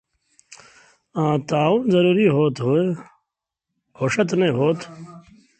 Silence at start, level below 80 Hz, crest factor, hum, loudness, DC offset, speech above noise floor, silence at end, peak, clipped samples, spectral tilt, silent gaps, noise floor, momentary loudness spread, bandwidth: 0.5 s; -62 dBFS; 18 dB; none; -20 LUFS; under 0.1%; 64 dB; 0.4 s; -4 dBFS; under 0.1%; -7 dB/octave; none; -83 dBFS; 14 LU; 8.8 kHz